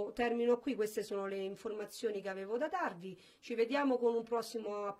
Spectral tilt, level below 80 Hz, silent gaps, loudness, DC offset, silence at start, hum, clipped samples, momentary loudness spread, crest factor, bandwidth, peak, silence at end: -4.5 dB/octave; -74 dBFS; none; -37 LUFS; under 0.1%; 0 s; none; under 0.1%; 10 LU; 16 dB; 15.5 kHz; -20 dBFS; 0.05 s